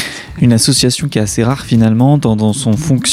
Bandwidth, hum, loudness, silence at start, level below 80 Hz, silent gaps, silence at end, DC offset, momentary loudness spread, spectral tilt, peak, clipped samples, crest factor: 15.5 kHz; none; -12 LUFS; 0 s; -36 dBFS; none; 0 s; under 0.1%; 5 LU; -5 dB/octave; 0 dBFS; under 0.1%; 12 dB